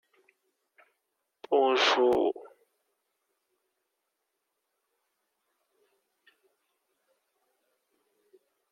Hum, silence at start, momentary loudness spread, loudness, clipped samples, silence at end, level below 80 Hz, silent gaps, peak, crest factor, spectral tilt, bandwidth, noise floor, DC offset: none; 1.5 s; 8 LU; -25 LUFS; under 0.1%; 6.3 s; -76 dBFS; none; -12 dBFS; 22 dB; -2.5 dB/octave; 10 kHz; -82 dBFS; under 0.1%